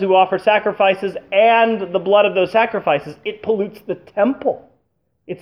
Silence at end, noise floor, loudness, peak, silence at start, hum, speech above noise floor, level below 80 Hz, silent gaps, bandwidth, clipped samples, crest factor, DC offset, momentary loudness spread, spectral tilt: 0.05 s; -68 dBFS; -17 LUFS; -2 dBFS; 0 s; none; 51 dB; -62 dBFS; none; 10 kHz; under 0.1%; 16 dB; under 0.1%; 12 LU; -6.5 dB/octave